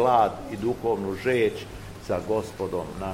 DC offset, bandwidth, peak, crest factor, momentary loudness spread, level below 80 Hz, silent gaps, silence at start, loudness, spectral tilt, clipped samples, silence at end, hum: 0.1%; 16 kHz; -8 dBFS; 18 dB; 10 LU; -48 dBFS; none; 0 s; -27 LUFS; -6 dB/octave; under 0.1%; 0 s; none